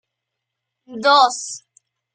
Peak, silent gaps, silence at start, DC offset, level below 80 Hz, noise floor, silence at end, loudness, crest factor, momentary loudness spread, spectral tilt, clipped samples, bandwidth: -2 dBFS; none; 0.9 s; under 0.1%; -78 dBFS; -81 dBFS; 0.55 s; -16 LUFS; 20 dB; 22 LU; -0.5 dB/octave; under 0.1%; 10 kHz